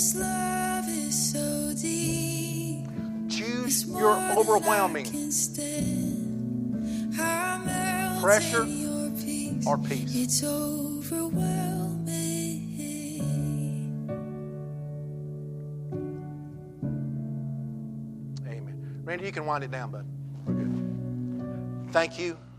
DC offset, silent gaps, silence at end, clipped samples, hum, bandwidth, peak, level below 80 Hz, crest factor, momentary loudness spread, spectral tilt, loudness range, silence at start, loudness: under 0.1%; none; 0 s; under 0.1%; none; 15.5 kHz; -8 dBFS; -56 dBFS; 22 dB; 14 LU; -4.5 dB/octave; 10 LU; 0 s; -29 LUFS